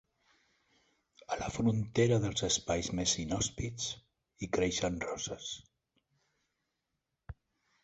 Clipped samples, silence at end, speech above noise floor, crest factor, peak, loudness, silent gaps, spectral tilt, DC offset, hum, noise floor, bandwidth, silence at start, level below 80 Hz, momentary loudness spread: under 0.1%; 0.5 s; 52 dB; 22 dB; -16 dBFS; -33 LUFS; none; -4 dB/octave; under 0.1%; none; -86 dBFS; 8.4 kHz; 1.3 s; -56 dBFS; 17 LU